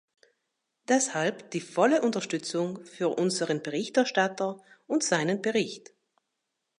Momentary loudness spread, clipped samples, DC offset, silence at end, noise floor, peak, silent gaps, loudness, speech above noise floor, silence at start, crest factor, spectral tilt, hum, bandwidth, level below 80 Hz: 10 LU; under 0.1%; under 0.1%; 1 s; -82 dBFS; -10 dBFS; none; -28 LUFS; 55 dB; 0.9 s; 20 dB; -4 dB/octave; none; 11.5 kHz; -82 dBFS